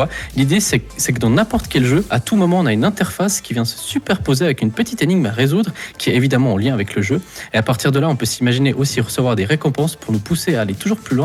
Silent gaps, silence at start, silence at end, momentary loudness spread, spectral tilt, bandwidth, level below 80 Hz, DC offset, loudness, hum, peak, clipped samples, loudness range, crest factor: none; 0 s; 0 s; 5 LU; -5 dB/octave; 16 kHz; -40 dBFS; under 0.1%; -17 LUFS; none; -4 dBFS; under 0.1%; 1 LU; 12 dB